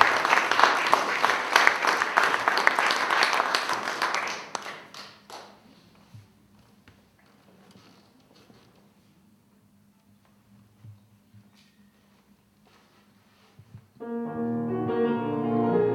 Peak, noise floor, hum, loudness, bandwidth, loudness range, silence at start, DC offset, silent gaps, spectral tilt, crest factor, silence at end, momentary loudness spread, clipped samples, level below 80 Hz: 0 dBFS; -61 dBFS; none; -24 LUFS; 17 kHz; 21 LU; 0 s; under 0.1%; none; -3 dB/octave; 28 dB; 0 s; 21 LU; under 0.1%; -72 dBFS